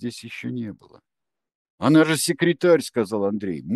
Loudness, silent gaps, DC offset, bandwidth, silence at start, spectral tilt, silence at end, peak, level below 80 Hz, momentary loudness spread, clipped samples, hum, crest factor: -21 LUFS; 1.55-1.78 s; under 0.1%; 12.5 kHz; 0 s; -5 dB/octave; 0 s; -4 dBFS; -66 dBFS; 15 LU; under 0.1%; none; 18 dB